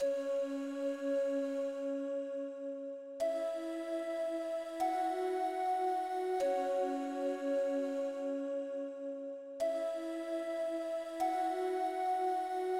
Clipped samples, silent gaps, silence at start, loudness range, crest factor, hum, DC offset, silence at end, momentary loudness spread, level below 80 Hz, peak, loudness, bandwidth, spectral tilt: under 0.1%; none; 0 s; 3 LU; 12 dB; none; under 0.1%; 0 s; 7 LU; -82 dBFS; -24 dBFS; -37 LUFS; 15.5 kHz; -3.5 dB/octave